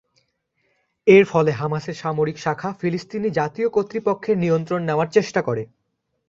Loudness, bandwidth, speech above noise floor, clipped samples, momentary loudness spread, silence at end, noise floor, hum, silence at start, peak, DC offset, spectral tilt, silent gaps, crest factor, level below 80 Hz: -21 LUFS; 7.6 kHz; 54 dB; under 0.1%; 11 LU; 0.65 s; -74 dBFS; none; 1.05 s; -2 dBFS; under 0.1%; -7 dB/octave; none; 20 dB; -60 dBFS